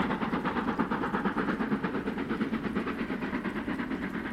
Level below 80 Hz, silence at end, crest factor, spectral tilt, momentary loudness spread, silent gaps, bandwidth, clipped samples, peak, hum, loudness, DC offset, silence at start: -52 dBFS; 0 s; 18 dB; -7.5 dB/octave; 3 LU; none; 13.5 kHz; under 0.1%; -14 dBFS; none; -32 LUFS; under 0.1%; 0 s